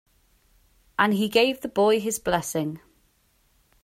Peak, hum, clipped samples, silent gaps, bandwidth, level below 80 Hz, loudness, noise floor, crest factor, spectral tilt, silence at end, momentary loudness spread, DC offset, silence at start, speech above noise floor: -4 dBFS; none; under 0.1%; none; 16 kHz; -58 dBFS; -24 LUFS; -65 dBFS; 22 dB; -4 dB/octave; 1.05 s; 12 LU; under 0.1%; 1 s; 42 dB